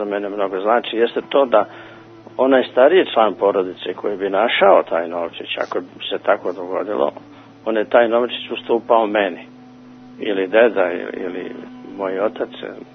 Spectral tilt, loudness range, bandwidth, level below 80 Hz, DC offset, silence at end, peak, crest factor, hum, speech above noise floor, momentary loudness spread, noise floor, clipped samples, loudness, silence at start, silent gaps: -6.5 dB/octave; 5 LU; 6.2 kHz; -68 dBFS; under 0.1%; 0.1 s; 0 dBFS; 18 dB; none; 23 dB; 14 LU; -41 dBFS; under 0.1%; -18 LUFS; 0 s; none